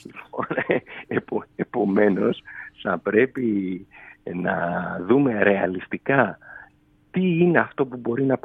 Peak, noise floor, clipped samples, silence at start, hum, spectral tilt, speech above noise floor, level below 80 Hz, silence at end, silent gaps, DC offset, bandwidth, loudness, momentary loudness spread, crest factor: -2 dBFS; -56 dBFS; under 0.1%; 0.05 s; none; -9.5 dB/octave; 34 dB; -62 dBFS; 0.05 s; none; under 0.1%; 4.1 kHz; -23 LUFS; 13 LU; 22 dB